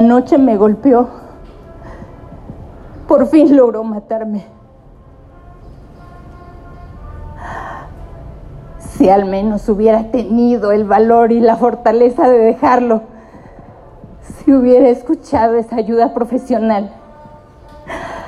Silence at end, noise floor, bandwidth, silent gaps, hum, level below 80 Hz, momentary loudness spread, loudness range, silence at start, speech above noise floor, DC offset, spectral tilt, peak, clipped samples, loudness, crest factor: 0 s; -41 dBFS; 11.5 kHz; none; none; -38 dBFS; 25 LU; 20 LU; 0 s; 30 dB; under 0.1%; -8 dB/octave; 0 dBFS; under 0.1%; -12 LUFS; 14 dB